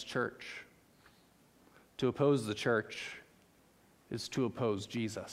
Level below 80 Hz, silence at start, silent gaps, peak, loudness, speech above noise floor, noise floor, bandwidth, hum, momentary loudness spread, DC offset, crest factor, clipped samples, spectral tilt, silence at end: -72 dBFS; 0 s; none; -18 dBFS; -36 LUFS; 31 dB; -66 dBFS; 15.5 kHz; none; 16 LU; under 0.1%; 20 dB; under 0.1%; -5.5 dB/octave; 0 s